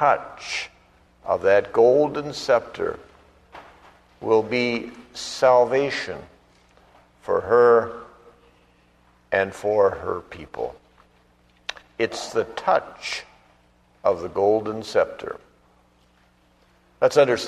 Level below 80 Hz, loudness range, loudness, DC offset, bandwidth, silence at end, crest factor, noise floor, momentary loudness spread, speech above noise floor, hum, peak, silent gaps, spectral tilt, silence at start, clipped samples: -58 dBFS; 5 LU; -22 LUFS; under 0.1%; 12.5 kHz; 0 s; 20 dB; -59 dBFS; 18 LU; 38 dB; 60 Hz at -60 dBFS; -4 dBFS; none; -4.5 dB/octave; 0 s; under 0.1%